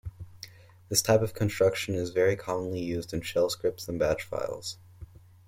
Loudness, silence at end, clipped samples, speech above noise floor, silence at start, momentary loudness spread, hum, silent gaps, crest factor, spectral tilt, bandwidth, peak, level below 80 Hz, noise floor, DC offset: -28 LUFS; 0.45 s; under 0.1%; 22 dB; 0.05 s; 19 LU; none; none; 22 dB; -4.5 dB/octave; 16.5 kHz; -8 dBFS; -54 dBFS; -50 dBFS; under 0.1%